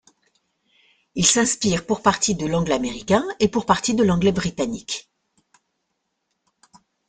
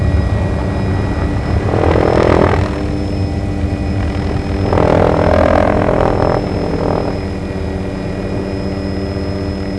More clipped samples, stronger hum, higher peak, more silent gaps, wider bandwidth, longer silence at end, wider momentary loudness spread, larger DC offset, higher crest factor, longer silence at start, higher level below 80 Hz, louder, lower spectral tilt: neither; neither; about the same, -2 dBFS vs 0 dBFS; neither; second, 9.8 kHz vs 11 kHz; first, 2.1 s vs 0 s; about the same, 9 LU vs 9 LU; second, under 0.1% vs 0.8%; first, 20 dB vs 14 dB; first, 1.15 s vs 0 s; second, -48 dBFS vs -22 dBFS; second, -20 LUFS vs -15 LUFS; second, -4 dB/octave vs -8 dB/octave